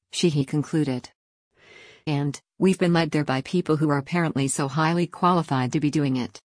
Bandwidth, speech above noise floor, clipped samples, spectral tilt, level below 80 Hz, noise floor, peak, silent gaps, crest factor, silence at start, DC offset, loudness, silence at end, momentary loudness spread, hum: 10.5 kHz; 27 dB; under 0.1%; -6 dB/octave; -62 dBFS; -50 dBFS; -8 dBFS; 1.15-1.51 s; 16 dB; 0.15 s; under 0.1%; -24 LUFS; 0.1 s; 6 LU; none